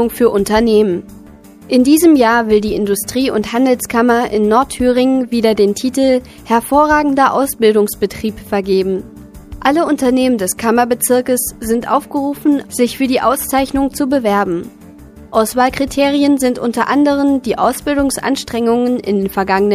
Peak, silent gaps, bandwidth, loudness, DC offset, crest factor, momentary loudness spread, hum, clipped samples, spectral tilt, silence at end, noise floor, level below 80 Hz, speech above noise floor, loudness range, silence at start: 0 dBFS; none; 15.5 kHz; -14 LUFS; under 0.1%; 14 dB; 6 LU; none; under 0.1%; -4.5 dB/octave; 0 s; -38 dBFS; -40 dBFS; 25 dB; 3 LU; 0 s